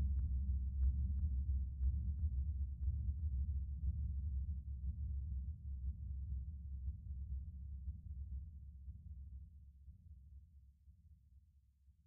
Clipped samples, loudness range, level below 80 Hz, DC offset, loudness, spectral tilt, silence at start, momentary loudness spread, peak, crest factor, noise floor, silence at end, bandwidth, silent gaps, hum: under 0.1%; 14 LU; -44 dBFS; under 0.1%; -44 LUFS; -21 dB/octave; 0 s; 16 LU; -28 dBFS; 14 dB; -70 dBFS; 0.15 s; 0.4 kHz; none; none